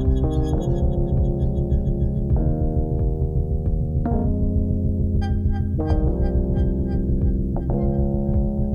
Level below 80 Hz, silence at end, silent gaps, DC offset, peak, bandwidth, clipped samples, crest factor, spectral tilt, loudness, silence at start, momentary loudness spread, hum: -22 dBFS; 0 s; none; under 0.1%; -8 dBFS; 6.8 kHz; under 0.1%; 12 dB; -10.5 dB/octave; -23 LUFS; 0 s; 2 LU; none